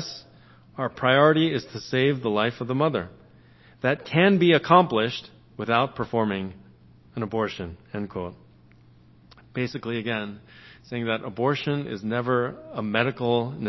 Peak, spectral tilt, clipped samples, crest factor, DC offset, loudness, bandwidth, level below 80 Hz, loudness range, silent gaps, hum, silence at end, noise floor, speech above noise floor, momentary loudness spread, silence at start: -2 dBFS; -7 dB/octave; under 0.1%; 22 dB; under 0.1%; -24 LUFS; 6.2 kHz; -56 dBFS; 11 LU; none; none; 0 s; -54 dBFS; 30 dB; 18 LU; 0 s